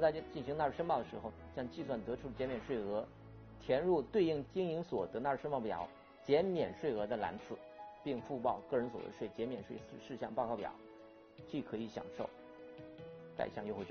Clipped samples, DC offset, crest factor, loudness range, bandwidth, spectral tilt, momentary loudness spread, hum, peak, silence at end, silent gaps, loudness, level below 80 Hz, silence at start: under 0.1%; under 0.1%; 20 dB; 8 LU; 6.6 kHz; -5.5 dB/octave; 18 LU; none; -20 dBFS; 0 s; none; -40 LUFS; -66 dBFS; 0 s